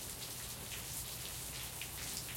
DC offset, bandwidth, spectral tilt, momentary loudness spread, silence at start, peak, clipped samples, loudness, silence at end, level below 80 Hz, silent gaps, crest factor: under 0.1%; 17 kHz; -1.5 dB/octave; 2 LU; 0 s; -20 dBFS; under 0.1%; -42 LUFS; 0 s; -58 dBFS; none; 24 dB